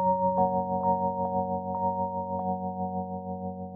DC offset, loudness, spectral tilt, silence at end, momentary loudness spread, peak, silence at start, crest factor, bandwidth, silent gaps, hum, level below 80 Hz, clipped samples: under 0.1%; -29 LUFS; -13 dB/octave; 0 s; 9 LU; -14 dBFS; 0 s; 16 dB; 2 kHz; none; none; -60 dBFS; under 0.1%